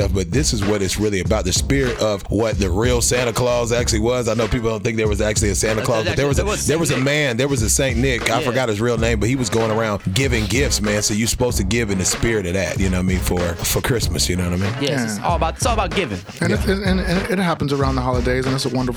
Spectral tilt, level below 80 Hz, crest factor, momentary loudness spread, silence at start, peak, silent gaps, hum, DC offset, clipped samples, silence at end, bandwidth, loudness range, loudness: -4.5 dB/octave; -28 dBFS; 18 dB; 3 LU; 0 s; 0 dBFS; none; none; under 0.1%; under 0.1%; 0 s; over 20 kHz; 2 LU; -19 LUFS